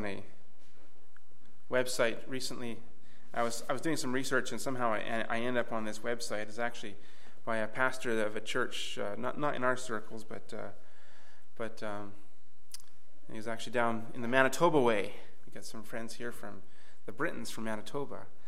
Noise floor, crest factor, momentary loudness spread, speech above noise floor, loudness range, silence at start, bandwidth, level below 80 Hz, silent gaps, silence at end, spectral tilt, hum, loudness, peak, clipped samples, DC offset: -67 dBFS; 28 dB; 18 LU; 32 dB; 9 LU; 0 s; 16.5 kHz; -72 dBFS; none; 0.2 s; -4 dB/octave; none; -35 LUFS; -10 dBFS; under 0.1%; 3%